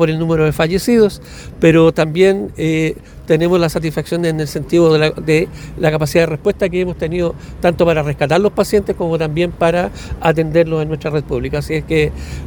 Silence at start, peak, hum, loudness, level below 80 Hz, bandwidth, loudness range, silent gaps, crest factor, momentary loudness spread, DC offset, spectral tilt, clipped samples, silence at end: 0 s; 0 dBFS; none; -15 LUFS; -34 dBFS; 19 kHz; 2 LU; none; 14 dB; 8 LU; under 0.1%; -6.5 dB/octave; under 0.1%; 0 s